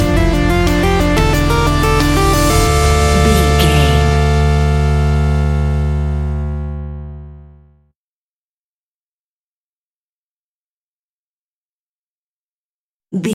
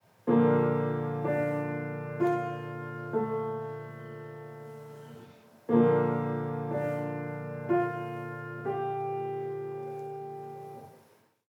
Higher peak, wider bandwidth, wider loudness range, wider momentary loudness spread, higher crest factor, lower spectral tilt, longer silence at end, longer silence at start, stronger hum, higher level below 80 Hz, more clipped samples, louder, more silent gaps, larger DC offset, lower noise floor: first, 0 dBFS vs -10 dBFS; first, 17 kHz vs 13 kHz; first, 15 LU vs 7 LU; second, 12 LU vs 19 LU; second, 14 dB vs 20 dB; second, -5.5 dB/octave vs -9.5 dB/octave; second, 0 s vs 0.5 s; second, 0 s vs 0.25 s; neither; first, -18 dBFS vs -82 dBFS; neither; first, -13 LUFS vs -31 LUFS; first, 7.96-13.00 s vs none; neither; first, under -90 dBFS vs -63 dBFS